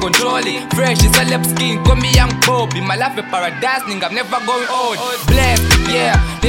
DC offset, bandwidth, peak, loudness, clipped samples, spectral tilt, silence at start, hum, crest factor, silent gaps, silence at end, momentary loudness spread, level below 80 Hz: under 0.1%; 17 kHz; 0 dBFS; -14 LUFS; under 0.1%; -4 dB/octave; 0 s; none; 14 dB; none; 0 s; 7 LU; -20 dBFS